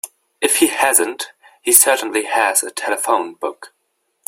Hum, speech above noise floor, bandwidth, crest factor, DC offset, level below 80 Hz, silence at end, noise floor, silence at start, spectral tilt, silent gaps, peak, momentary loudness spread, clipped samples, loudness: none; 52 dB; 16.5 kHz; 18 dB; under 0.1%; -66 dBFS; 0.6 s; -68 dBFS; 0.05 s; 0.5 dB/octave; none; 0 dBFS; 17 LU; under 0.1%; -15 LUFS